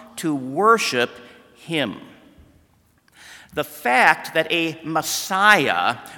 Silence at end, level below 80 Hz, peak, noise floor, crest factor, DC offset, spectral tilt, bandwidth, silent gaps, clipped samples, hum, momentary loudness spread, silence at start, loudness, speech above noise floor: 0 s; -64 dBFS; 0 dBFS; -59 dBFS; 22 dB; under 0.1%; -3 dB/octave; 18 kHz; none; under 0.1%; none; 13 LU; 0 s; -19 LUFS; 39 dB